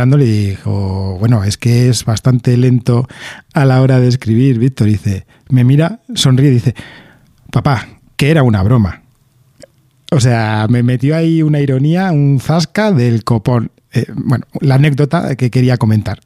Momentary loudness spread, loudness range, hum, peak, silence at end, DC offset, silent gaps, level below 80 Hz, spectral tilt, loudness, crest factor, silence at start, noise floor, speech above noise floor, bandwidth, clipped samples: 8 LU; 2 LU; none; 0 dBFS; 0.1 s; under 0.1%; none; -42 dBFS; -7 dB/octave; -12 LUFS; 12 dB; 0 s; -51 dBFS; 40 dB; 13.5 kHz; under 0.1%